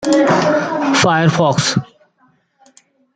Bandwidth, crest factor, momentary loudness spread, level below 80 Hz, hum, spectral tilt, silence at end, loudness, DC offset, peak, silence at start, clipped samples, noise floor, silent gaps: 9.4 kHz; 14 dB; 5 LU; -56 dBFS; none; -5 dB/octave; 1.3 s; -14 LUFS; under 0.1%; -2 dBFS; 0 s; under 0.1%; -57 dBFS; none